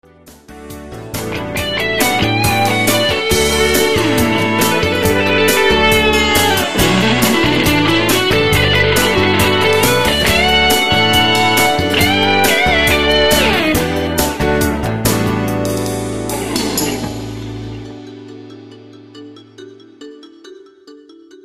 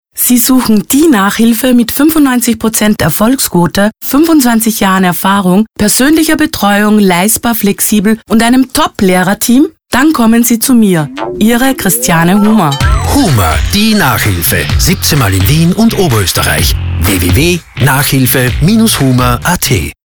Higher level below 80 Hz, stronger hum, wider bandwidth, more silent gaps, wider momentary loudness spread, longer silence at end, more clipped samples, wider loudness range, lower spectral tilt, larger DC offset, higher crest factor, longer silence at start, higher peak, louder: second, -30 dBFS vs -24 dBFS; neither; second, 15.5 kHz vs over 20 kHz; neither; first, 13 LU vs 3 LU; second, 0 s vs 0.15 s; neither; first, 10 LU vs 1 LU; about the same, -3.5 dB/octave vs -4.5 dB/octave; first, 2% vs under 0.1%; first, 14 dB vs 8 dB; second, 0 s vs 0.15 s; about the same, 0 dBFS vs 0 dBFS; second, -12 LUFS vs -8 LUFS